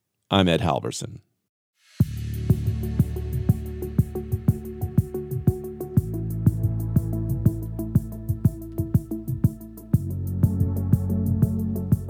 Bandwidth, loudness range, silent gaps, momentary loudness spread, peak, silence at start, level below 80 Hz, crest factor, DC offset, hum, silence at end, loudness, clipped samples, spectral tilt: 16 kHz; 1 LU; 1.49-1.73 s; 7 LU; -2 dBFS; 0.3 s; -36 dBFS; 22 dB; under 0.1%; none; 0 s; -25 LUFS; under 0.1%; -7.5 dB/octave